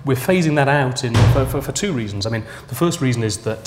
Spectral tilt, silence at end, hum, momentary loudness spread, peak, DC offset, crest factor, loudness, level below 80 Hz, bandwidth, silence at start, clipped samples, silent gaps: -5.5 dB/octave; 0 s; none; 8 LU; 0 dBFS; under 0.1%; 18 dB; -18 LUFS; -34 dBFS; 16 kHz; 0 s; under 0.1%; none